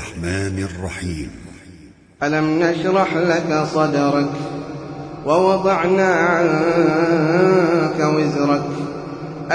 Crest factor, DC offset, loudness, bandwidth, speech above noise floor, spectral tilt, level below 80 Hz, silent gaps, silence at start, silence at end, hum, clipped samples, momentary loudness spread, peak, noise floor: 16 dB; under 0.1%; -18 LUFS; 10.5 kHz; 27 dB; -6.5 dB/octave; -46 dBFS; none; 0 s; 0 s; none; under 0.1%; 14 LU; -2 dBFS; -44 dBFS